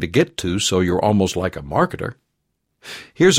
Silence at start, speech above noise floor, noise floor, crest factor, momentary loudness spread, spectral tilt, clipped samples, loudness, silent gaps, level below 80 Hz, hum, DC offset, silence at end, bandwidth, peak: 0 s; 54 dB; -73 dBFS; 18 dB; 16 LU; -4.5 dB/octave; under 0.1%; -19 LUFS; none; -46 dBFS; none; under 0.1%; 0 s; 16 kHz; -2 dBFS